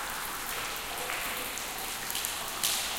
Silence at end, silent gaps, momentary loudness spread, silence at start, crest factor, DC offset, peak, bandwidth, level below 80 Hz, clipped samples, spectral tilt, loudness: 0 s; none; 5 LU; 0 s; 24 dB; under 0.1%; -10 dBFS; 17 kHz; -54 dBFS; under 0.1%; 0 dB/octave; -32 LUFS